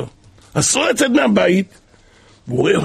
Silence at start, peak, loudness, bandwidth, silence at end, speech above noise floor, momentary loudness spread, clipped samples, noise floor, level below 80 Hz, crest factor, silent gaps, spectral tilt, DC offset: 0 s; -2 dBFS; -16 LUFS; 15 kHz; 0 s; 34 dB; 12 LU; under 0.1%; -49 dBFS; -50 dBFS; 14 dB; none; -4 dB/octave; under 0.1%